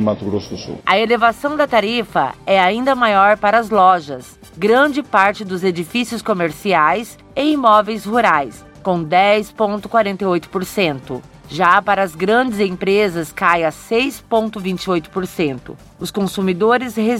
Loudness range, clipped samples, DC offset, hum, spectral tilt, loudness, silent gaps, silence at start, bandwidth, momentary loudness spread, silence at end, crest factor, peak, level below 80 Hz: 4 LU; under 0.1%; under 0.1%; none; -5 dB/octave; -16 LUFS; none; 0 s; 16.5 kHz; 10 LU; 0 s; 16 dB; 0 dBFS; -50 dBFS